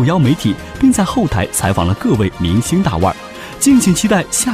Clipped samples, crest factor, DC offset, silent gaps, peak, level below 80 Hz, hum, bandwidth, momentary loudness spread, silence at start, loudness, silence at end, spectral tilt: under 0.1%; 12 dB; 0.2%; none; -2 dBFS; -34 dBFS; none; 16 kHz; 6 LU; 0 s; -14 LUFS; 0 s; -5 dB/octave